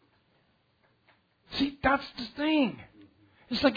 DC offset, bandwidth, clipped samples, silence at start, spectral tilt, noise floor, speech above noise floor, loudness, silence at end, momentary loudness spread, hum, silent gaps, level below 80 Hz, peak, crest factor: under 0.1%; 5 kHz; under 0.1%; 1.5 s; -6 dB/octave; -69 dBFS; 41 dB; -29 LUFS; 0 s; 11 LU; none; none; -54 dBFS; -8 dBFS; 22 dB